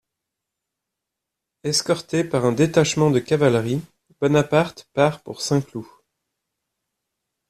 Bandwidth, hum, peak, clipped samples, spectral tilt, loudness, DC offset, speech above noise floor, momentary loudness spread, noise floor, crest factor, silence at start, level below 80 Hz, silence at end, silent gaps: 14 kHz; none; -4 dBFS; under 0.1%; -5 dB/octave; -21 LUFS; under 0.1%; 63 dB; 10 LU; -83 dBFS; 20 dB; 1.65 s; -58 dBFS; 1.65 s; none